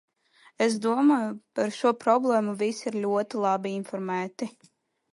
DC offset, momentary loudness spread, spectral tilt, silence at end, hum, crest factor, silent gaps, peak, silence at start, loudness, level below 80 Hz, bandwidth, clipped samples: under 0.1%; 10 LU; -5.5 dB/octave; 0.65 s; none; 18 dB; none; -8 dBFS; 0.6 s; -26 LUFS; -78 dBFS; 11.5 kHz; under 0.1%